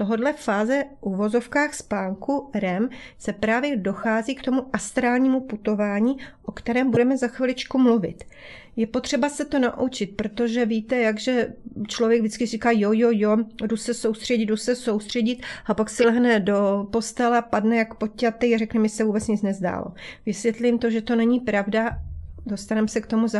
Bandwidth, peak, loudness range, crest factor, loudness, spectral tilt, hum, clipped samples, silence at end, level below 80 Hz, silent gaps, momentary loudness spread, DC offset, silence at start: 12 kHz; -6 dBFS; 3 LU; 16 dB; -23 LUFS; -5.5 dB/octave; none; under 0.1%; 0 s; -50 dBFS; none; 9 LU; under 0.1%; 0 s